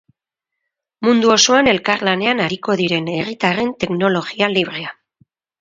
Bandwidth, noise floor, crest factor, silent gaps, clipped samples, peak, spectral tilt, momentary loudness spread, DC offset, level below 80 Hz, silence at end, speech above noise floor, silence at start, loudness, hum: 7.8 kHz; -82 dBFS; 18 dB; none; under 0.1%; 0 dBFS; -3.5 dB/octave; 9 LU; under 0.1%; -54 dBFS; 0.7 s; 65 dB; 1 s; -16 LUFS; none